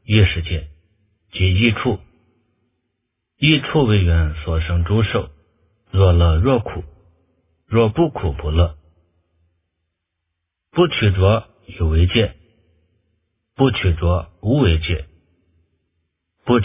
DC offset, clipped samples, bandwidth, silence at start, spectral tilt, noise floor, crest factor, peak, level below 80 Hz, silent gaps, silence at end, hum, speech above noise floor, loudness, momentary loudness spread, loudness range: under 0.1%; under 0.1%; 3.8 kHz; 0.1 s; -11 dB/octave; -77 dBFS; 18 dB; 0 dBFS; -26 dBFS; none; 0 s; none; 61 dB; -18 LUFS; 10 LU; 4 LU